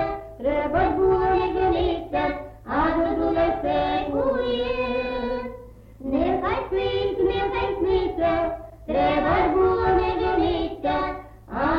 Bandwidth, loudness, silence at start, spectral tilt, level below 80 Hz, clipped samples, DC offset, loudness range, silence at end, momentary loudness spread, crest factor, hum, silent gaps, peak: 5.8 kHz; -23 LUFS; 0 s; -8 dB/octave; -38 dBFS; under 0.1%; under 0.1%; 3 LU; 0 s; 9 LU; 12 dB; none; none; -10 dBFS